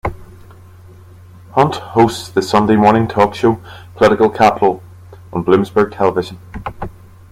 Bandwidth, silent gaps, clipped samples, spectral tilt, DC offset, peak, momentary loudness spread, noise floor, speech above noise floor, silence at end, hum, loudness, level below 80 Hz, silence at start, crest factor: 15.5 kHz; none; under 0.1%; -6.5 dB/octave; under 0.1%; 0 dBFS; 17 LU; -39 dBFS; 26 dB; 0.4 s; none; -14 LUFS; -42 dBFS; 0.05 s; 16 dB